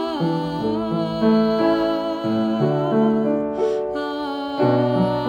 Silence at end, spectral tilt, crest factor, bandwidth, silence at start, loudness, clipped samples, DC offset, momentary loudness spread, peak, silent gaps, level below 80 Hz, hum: 0 s; -8 dB/octave; 14 dB; 9.2 kHz; 0 s; -21 LUFS; under 0.1%; under 0.1%; 6 LU; -6 dBFS; none; -52 dBFS; none